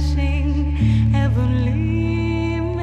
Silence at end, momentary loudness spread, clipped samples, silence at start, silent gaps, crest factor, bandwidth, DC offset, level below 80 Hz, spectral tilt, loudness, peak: 0 s; 4 LU; under 0.1%; 0 s; none; 12 dB; 8 kHz; under 0.1%; -24 dBFS; -8.5 dB/octave; -19 LUFS; -6 dBFS